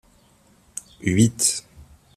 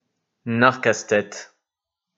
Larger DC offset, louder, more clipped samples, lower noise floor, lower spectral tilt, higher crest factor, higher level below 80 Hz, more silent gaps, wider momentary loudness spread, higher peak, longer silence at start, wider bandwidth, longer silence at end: neither; about the same, -21 LUFS vs -20 LUFS; neither; second, -57 dBFS vs -85 dBFS; about the same, -4 dB/octave vs -4.5 dB/octave; about the same, 22 dB vs 24 dB; first, -54 dBFS vs -68 dBFS; neither; about the same, 19 LU vs 19 LU; second, -4 dBFS vs 0 dBFS; first, 1 s vs 0.45 s; first, 14.5 kHz vs 8 kHz; second, 0.35 s vs 0.75 s